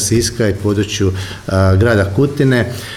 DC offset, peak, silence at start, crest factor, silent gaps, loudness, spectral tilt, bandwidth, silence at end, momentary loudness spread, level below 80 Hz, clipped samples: under 0.1%; -2 dBFS; 0 s; 12 dB; none; -14 LUFS; -5.5 dB/octave; 14.5 kHz; 0 s; 6 LU; -36 dBFS; under 0.1%